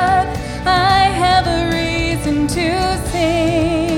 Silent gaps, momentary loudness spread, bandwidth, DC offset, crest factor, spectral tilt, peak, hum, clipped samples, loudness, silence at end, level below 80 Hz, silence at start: none; 5 LU; 16.5 kHz; under 0.1%; 14 dB; -5 dB/octave; -2 dBFS; none; under 0.1%; -16 LUFS; 0 s; -28 dBFS; 0 s